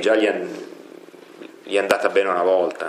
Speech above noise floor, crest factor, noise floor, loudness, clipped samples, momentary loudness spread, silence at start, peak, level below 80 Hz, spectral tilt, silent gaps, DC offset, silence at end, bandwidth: 23 dB; 20 dB; -43 dBFS; -20 LUFS; under 0.1%; 23 LU; 0 s; -2 dBFS; -78 dBFS; -3.5 dB/octave; none; under 0.1%; 0 s; 15.5 kHz